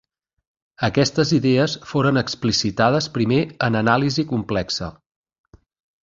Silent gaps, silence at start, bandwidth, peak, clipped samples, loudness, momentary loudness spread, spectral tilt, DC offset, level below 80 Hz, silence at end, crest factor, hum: none; 0.8 s; 7.8 kHz; -2 dBFS; under 0.1%; -20 LUFS; 6 LU; -5.5 dB/octave; under 0.1%; -48 dBFS; 1.1 s; 20 dB; none